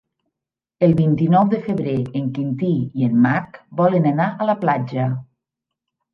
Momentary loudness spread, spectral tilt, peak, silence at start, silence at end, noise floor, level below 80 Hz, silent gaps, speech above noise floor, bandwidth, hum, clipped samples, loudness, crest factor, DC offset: 8 LU; -10.5 dB/octave; -2 dBFS; 0.8 s; 0.9 s; -86 dBFS; -56 dBFS; none; 68 dB; 5.6 kHz; none; under 0.1%; -19 LUFS; 16 dB; under 0.1%